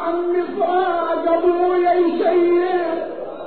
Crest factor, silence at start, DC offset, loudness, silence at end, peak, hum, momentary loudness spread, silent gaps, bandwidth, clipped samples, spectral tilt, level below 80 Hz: 12 dB; 0 s; 0.8%; -18 LUFS; 0 s; -6 dBFS; none; 5 LU; none; 4.5 kHz; under 0.1%; -3 dB/octave; -56 dBFS